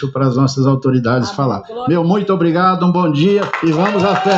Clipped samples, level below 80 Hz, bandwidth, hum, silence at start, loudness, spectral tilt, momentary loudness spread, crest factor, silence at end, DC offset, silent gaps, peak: under 0.1%; -52 dBFS; 7.8 kHz; none; 0 s; -14 LUFS; -7 dB/octave; 5 LU; 12 dB; 0 s; under 0.1%; none; -2 dBFS